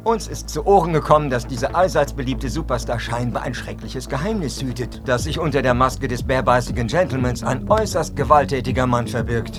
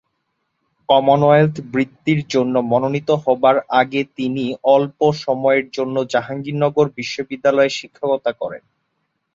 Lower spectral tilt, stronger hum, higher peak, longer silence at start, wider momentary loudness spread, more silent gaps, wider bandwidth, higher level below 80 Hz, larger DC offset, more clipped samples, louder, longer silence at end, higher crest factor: about the same, -5.5 dB/octave vs -6.5 dB/octave; neither; about the same, 0 dBFS vs -2 dBFS; second, 0 s vs 0.9 s; about the same, 10 LU vs 10 LU; neither; first, 15 kHz vs 7.6 kHz; first, -32 dBFS vs -60 dBFS; neither; neither; about the same, -20 LUFS vs -18 LUFS; second, 0 s vs 0.75 s; about the same, 20 dB vs 16 dB